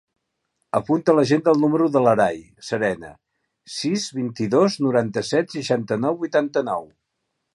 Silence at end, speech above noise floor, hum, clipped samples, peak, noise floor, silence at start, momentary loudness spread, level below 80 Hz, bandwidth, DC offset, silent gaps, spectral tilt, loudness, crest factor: 0.7 s; 56 dB; none; under 0.1%; -2 dBFS; -77 dBFS; 0.75 s; 10 LU; -62 dBFS; 11.5 kHz; under 0.1%; none; -5.5 dB/octave; -21 LUFS; 18 dB